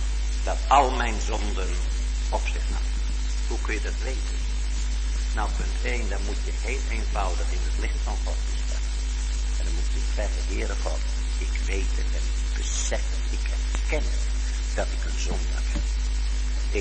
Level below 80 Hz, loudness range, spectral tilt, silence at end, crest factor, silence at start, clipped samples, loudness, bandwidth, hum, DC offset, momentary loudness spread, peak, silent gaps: -26 dBFS; 3 LU; -4 dB/octave; 0 s; 18 dB; 0 s; under 0.1%; -28 LUFS; 8.8 kHz; none; under 0.1%; 3 LU; -6 dBFS; none